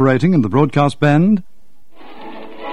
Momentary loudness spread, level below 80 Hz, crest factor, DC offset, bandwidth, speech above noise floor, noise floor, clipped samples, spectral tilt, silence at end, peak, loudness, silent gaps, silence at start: 21 LU; -52 dBFS; 16 dB; 3%; 11 kHz; 42 dB; -55 dBFS; under 0.1%; -8 dB/octave; 0 s; 0 dBFS; -14 LUFS; none; 0 s